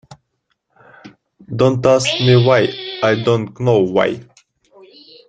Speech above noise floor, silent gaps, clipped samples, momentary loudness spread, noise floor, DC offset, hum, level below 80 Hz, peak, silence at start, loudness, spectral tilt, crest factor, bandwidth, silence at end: 55 dB; none; under 0.1%; 9 LU; -69 dBFS; under 0.1%; none; -52 dBFS; 0 dBFS; 0.1 s; -15 LUFS; -6 dB/octave; 16 dB; 9.2 kHz; 1.05 s